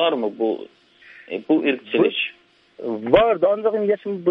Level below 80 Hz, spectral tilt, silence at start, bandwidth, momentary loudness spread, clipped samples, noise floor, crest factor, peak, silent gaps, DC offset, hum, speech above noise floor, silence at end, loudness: -54 dBFS; -8 dB/octave; 0 s; 5.4 kHz; 14 LU; under 0.1%; -48 dBFS; 20 dB; 0 dBFS; none; under 0.1%; none; 28 dB; 0 s; -20 LUFS